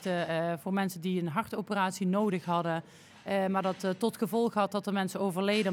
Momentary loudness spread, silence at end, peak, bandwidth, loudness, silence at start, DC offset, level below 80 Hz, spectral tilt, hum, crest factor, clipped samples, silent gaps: 5 LU; 0 s; -14 dBFS; 17 kHz; -31 LUFS; 0 s; under 0.1%; -78 dBFS; -6 dB/octave; none; 16 dB; under 0.1%; none